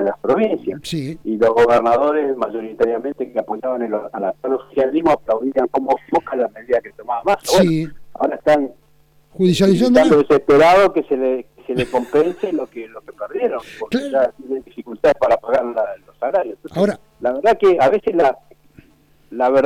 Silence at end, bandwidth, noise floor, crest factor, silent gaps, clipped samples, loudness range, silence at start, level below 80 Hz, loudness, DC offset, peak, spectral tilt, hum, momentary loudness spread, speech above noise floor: 0 s; 16.5 kHz; -54 dBFS; 16 dB; none; under 0.1%; 6 LU; 0 s; -50 dBFS; -17 LUFS; under 0.1%; 0 dBFS; -6 dB/octave; none; 13 LU; 37 dB